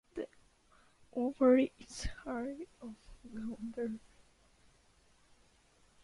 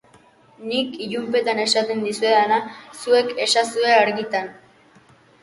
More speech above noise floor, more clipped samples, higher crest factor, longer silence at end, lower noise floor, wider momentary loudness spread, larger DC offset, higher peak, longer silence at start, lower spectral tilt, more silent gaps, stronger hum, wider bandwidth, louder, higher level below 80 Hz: about the same, 33 dB vs 33 dB; neither; about the same, 22 dB vs 18 dB; first, 2.05 s vs 0.9 s; first, -68 dBFS vs -53 dBFS; first, 22 LU vs 11 LU; neither; second, -16 dBFS vs -2 dBFS; second, 0.15 s vs 0.6 s; first, -5.5 dB/octave vs -2.5 dB/octave; neither; neither; about the same, 11.5 kHz vs 11.5 kHz; second, -36 LUFS vs -20 LUFS; first, -58 dBFS vs -70 dBFS